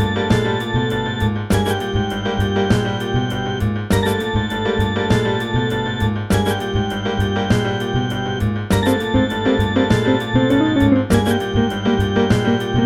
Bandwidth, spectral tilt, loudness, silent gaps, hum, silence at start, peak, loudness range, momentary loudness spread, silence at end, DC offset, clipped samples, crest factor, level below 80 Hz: 16 kHz; -6.5 dB/octave; -18 LUFS; none; none; 0 s; -2 dBFS; 3 LU; 5 LU; 0 s; under 0.1%; under 0.1%; 16 dB; -32 dBFS